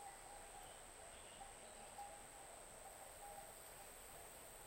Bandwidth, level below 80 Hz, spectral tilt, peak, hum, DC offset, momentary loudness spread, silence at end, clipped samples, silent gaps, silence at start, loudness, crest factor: 16 kHz; -70 dBFS; -1.5 dB/octave; -42 dBFS; none; under 0.1%; 2 LU; 0 s; under 0.1%; none; 0 s; -56 LUFS; 16 dB